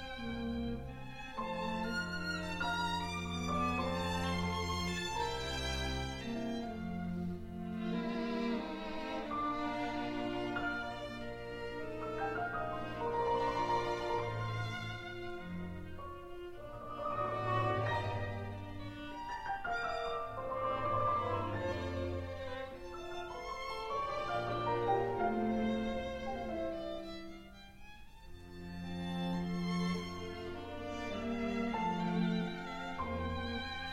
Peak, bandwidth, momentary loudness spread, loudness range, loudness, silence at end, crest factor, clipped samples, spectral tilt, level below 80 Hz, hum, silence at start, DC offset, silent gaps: -22 dBFS; 16 kHz; 11 LU; 4 LU; -38 LUFS; 0 s; 16 dB; under 0.1%; -5.5 dB/octave; -52 dBFS; none; 0 s; under 0.1%; none